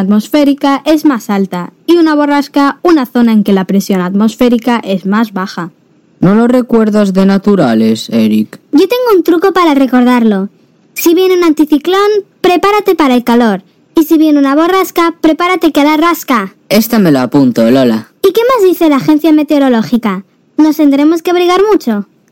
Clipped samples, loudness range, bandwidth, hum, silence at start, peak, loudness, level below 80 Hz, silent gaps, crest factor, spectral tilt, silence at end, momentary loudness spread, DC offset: under 0.1%; 2 LU; 17 kHz; none; 0 s; 0 dBFS; -9 LUFS; -48 dBFS; none; 8 dB; -6 dB/octave; 0.3 s; 6 LU; under 0.1%